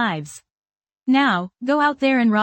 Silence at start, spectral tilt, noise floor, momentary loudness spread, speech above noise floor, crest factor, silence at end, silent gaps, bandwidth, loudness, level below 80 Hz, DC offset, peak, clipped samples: 0 s; -5.5 dB/octave; under -90 dBFS; 13 LU; over 71 dB; 14 dB; 0 s; 0.54-0.58 s, 0.77-0.81 s; 17 kHz; -19 LUFS; -68 dBFS; under 0.1%; -6 dBFS; under 0.1%